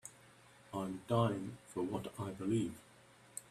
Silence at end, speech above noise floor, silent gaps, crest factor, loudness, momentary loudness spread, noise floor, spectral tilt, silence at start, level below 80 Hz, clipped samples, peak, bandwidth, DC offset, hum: 0.1 s; 24 dB; none; 22 dB; -39 LUFS; 16 LU; -63 dBFS; -6.5 dB/octave; 0.05 s; -70 dBFS; under 0.1%; -18 dBFS; 14.5 kHz; under 0.1%; none